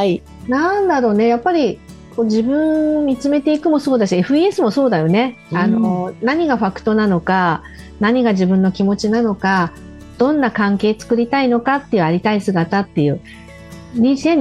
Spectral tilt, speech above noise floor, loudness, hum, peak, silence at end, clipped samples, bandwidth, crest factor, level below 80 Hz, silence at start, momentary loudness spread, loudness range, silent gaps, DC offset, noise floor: -7 dB/octave; 21 dB; -16 LUFS; none; -4 dBFS; 0 s; under 0.1%; 11.5 kHz; 12 dB; -46 dBFS; 0 s; 5 LU; 1 LU; none; under 0.1%; -36 dBFS